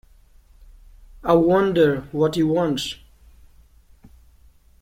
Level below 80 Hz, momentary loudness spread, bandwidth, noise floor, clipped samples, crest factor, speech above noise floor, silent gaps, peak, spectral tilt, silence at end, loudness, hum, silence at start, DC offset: -48 dBFS; 14 LU; 16.5 kHz; -52 dBFS; under 0.1%; 20 dB; 34 dB; none; -4 dBFS; -6.5 dB/octave; 1.85 s; -20 LUFS; none; 1.2 s; under 0.1%